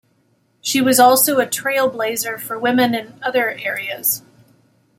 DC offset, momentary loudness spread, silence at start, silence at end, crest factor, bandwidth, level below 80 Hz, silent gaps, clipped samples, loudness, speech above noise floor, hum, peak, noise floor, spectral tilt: under 0.1%; 12 LU; 0.65 s; 0.8 s; 16 dB; 16.5 kHz; -64 dBFS; none; under 0.1%; -17 LUFS; 44 dB; none; -2 dBFS; -61 dBFS; -2.5 dB/octave